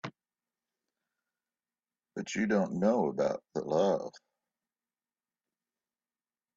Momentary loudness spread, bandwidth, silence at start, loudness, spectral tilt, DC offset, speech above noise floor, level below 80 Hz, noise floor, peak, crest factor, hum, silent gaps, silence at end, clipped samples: 16 LU; 7.8 kHz; 0.05 s; -31 LUFS; -6 dB/octave; under 0.1%; over 60 dB; -74 dBFS; under -90 dBFS; -14 dBFS; 22 dB; none; none; 2.4 s; under 0.1%